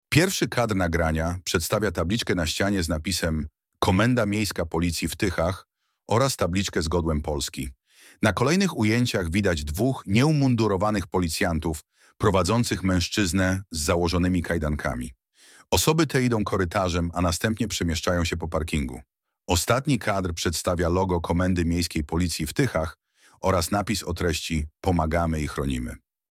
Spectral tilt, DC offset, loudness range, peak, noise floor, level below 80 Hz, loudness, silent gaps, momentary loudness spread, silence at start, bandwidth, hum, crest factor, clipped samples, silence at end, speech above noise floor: -5 dB/octave; under 0.1%; 3 LU; -6 dBFS; -55 dBFS; -38 dBFS; -24 LUFS; none; 7 LU; 0.1 s; 16.5 kHz; none; 18 dB; under 0.1%; 0.35 s; 31 dB